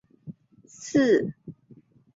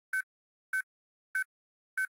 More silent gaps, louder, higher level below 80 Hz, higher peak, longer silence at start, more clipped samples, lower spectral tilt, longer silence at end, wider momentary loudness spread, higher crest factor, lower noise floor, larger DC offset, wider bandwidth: second, none vs 0.23-0.73 s, 0.83-1.34 s, 1.45-1.97 s; first, -24 LUFS vs -37 LUFS; first, -66 dBFS vs under -90 dBFS; first, -10 dBFS vs -24 dBFS; about the same, 0.25 s vs 0.15 s; neither; first, -5.5 dB/octave vs 6 dB/octave; first, 0.65 s vs 0.05 s; first, 25 LU vs 9 LU; about the same, 18 dB vs 14 dB; second, -55 dBFS vs under -90 dBFS; neither; second, 7.8 kHz vs 16 kHz